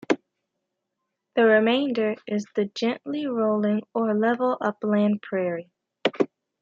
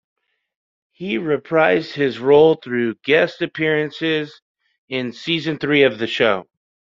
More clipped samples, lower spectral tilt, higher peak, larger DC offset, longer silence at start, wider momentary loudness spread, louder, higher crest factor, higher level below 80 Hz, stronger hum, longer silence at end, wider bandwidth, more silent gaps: neither; about the same, -6.5 dB/octave vs -6.5 dB/octave; second, -8 dBFS vs -2 dBFS; neither; second, 0.1 s vs 1 s; about the same, 9 LU vs 11 LU; second, -24 LUFS vs -18 LUFS; about the same, 18 dB vs 18 dB; second, -76 dBFS vs -62 dBFS; neither; second, 0.35 s vs 0.55 s; about the same, 7.4 kHz vs 7.4 kHz; second, none vs 4.42-4.55 s, 4.78-4.88 s